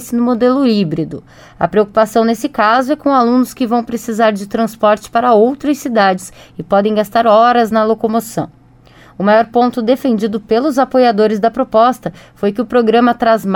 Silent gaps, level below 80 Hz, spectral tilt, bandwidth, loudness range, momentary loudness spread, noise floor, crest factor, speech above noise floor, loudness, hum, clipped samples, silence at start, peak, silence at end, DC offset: none; -50 dBFS; -6 dB/octave; 18 kHz; 2 LU; 9 LU; -43 dBFS; 12 dB; 30 dB; -13 LUFS; none; under 0.1%; 0 s; 0 dBFS; 0 s; under 0.1%